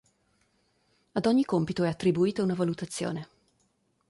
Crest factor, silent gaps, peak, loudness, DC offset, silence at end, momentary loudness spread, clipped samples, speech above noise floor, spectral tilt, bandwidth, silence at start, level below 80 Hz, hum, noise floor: 18 dB; none; -12 dBFS; -28 LUFS; under 0.1%; 0.85 s; 10 LU; under 0.1%; 45 dB; -6.5 dB/octave; 11.5 kHz; 1.15 s; -64 dBFS; none; -72 dBFS